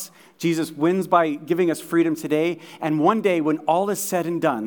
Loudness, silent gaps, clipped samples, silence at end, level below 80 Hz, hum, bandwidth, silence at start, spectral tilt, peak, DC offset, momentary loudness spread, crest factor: -22 LUFS; none; under 0.1%; 0 s; -82 dBFS; none; 19.5 kHz; 0 s; -5.5 dB/octave; -4 dBFS; under 0.1%; 6 LU; 18 dB